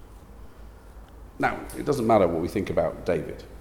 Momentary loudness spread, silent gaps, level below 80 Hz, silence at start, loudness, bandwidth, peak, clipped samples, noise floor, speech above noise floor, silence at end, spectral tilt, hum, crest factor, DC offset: 9 LU; none; -46 dBFS; 0 s; -25 LUFS; 18.5 kHz; -6 dBFS; under 0.1%; -45 dBFS; 20 dB; 0 s; -6.5 dB/octave; none; 20 dB; under 0.1%